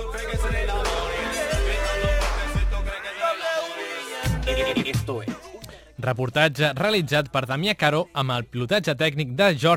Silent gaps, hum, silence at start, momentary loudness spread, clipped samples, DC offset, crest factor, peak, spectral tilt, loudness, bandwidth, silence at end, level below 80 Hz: none; none; 0 s; 10 LU; under 0.1%; under 0.1%; 20 dB; -4 dBFS; -5 dB/octave; -24 LUFS; 16.5 kHz; 0 s; -32 dBFS